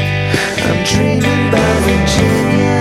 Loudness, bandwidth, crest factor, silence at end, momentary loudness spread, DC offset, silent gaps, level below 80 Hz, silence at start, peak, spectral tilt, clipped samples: -13 LUFS; 16 kHz; 12 dB; 0 s; 3 LU; under 0.1%; none; -28 dBFS; 0 s; 0 dBFS; -5 dB/octave; under 0.1%